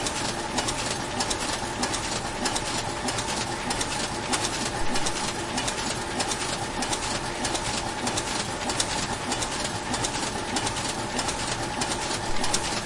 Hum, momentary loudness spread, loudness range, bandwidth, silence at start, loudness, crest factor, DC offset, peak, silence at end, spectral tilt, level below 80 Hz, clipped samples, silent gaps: none; 2 LU; 0 LU; 11.5 kHz; 0 s; -27 LUFS; 20 dB; under 0.1%; -8 dBFS; 0 s; -2.5 dB/octave; -42 dBFS; under 0.1%; none